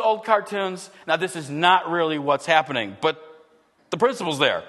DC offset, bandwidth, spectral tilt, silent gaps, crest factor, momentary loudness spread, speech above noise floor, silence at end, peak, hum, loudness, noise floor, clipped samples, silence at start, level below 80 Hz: under 0.1%; 12.5 kHz; -4 dB/octave; none; 20 dB; 10 LU; 35 dB; 0 s; -2 dBFS; none; -22 LUFS; -57 dBFS; under 0.1%; 0 s; -72 dBFS